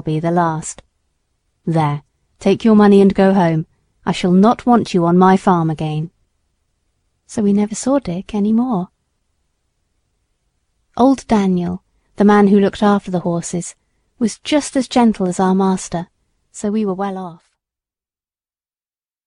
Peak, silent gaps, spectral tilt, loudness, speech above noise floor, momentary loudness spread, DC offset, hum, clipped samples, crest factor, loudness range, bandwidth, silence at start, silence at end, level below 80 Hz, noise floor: 0 dBFS; none; -6.5 dB/octave; -15 LUFS; over 76 dB; 16 LU; under 0.1%; none; under 0.1%; 16 dB; 7 LU; 11 kHz; 0.05 s; 1.9 s; -48 dBFS; under -90 dBFS